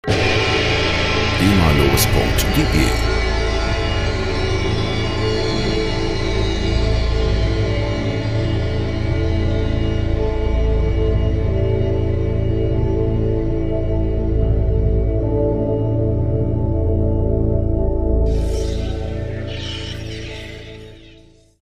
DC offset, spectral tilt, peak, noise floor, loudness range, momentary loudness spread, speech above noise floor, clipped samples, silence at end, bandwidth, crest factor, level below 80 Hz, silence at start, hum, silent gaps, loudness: under 0.1%; -6 dB/octave; -2 dBFS; -47 dBFS; 4 LU; 7 LU; 32 dB; under 0.1%; 0.55 s; 15.5 kHz; 16 dB; -22 dBFS; 0.05 s; none; none; -19 LUFS